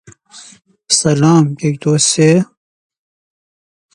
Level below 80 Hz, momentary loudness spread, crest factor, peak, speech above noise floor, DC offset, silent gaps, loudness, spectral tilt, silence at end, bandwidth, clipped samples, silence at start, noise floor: -54 dBFS; 6 LU; 16 dB; 0 dBFS; 29 dB; under 0.1%; none; -12 LUFS; -4.5 dB/octave; 1.5 s; 11 kHz; under 0.1%; 0.35 s; -40 dBFS